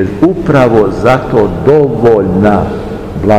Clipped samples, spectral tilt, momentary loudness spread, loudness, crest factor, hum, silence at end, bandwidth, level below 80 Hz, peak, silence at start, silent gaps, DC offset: 4%; -8.5 dB/octave; 8 LU; -9 LUFS; 8 dB; none; 0 s; 11 kHz; -28 dBFS; 0 dBFS; 0 s; none; under 0.1%